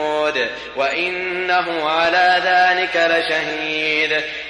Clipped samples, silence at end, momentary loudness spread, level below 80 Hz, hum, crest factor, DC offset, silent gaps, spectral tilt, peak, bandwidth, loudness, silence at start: under 0.1%; 0 s; 7 LU; -56 dBFS; none; 12 dB; under 0.1%; none; -3 dB/octave; -6 dBFS; 11 kHz; -17 LUFS; 0 s